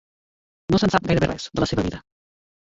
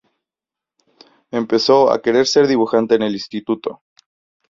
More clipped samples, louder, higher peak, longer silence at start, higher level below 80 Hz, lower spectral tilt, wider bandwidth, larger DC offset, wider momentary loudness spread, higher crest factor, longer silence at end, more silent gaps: neither; second, -22 LUFS vs -16 LUFS; about the same, -2 dBFS vs 0 dBFS; second, 0.7 s vs 1.35 s; first, -42 dBFS vs -62 dBFS; first, -6 dB/octave vs -4.5 dB/octave; about the same, 7.8 kHz vs 7.8 kHz; neither; about the same, 14 LU vs 12 LU; about the same, 22 dB vs 18 dB; about the same, 0.7 s vs 0.75 s; neither